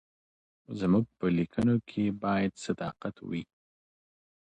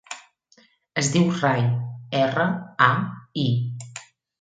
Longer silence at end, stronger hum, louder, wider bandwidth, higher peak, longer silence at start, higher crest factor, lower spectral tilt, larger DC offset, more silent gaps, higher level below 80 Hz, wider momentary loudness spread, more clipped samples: first, 1.05 s vs 0.4 s; neither; second, -31 LUFS vs -23 LUFS; about the same, 9.4 kHz vs 9.4 kHz; second, -16 dBFS vs 0 dBFS; first, 0.7 s vs 0.1 s; second, 16 dB vs 24 dB; first, -7.5 dB/octave vs -5 dB/octave; neither; neither; about the same, -60 dBFS vs -64 dBFS; second, 11 LU vs 18 LU; neither